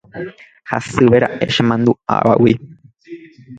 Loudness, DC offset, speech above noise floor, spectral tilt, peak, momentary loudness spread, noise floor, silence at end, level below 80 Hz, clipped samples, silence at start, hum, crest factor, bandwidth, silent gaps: -15 LUFS; under 0.1%; 22 dB; -6.5 dB/octave; 0 dBFS; 18 LU; -37 dBFS; 0 s; -48 dBFS; under 0.1%; 0.15 s; none; 16 dB; 9.2 kHz; none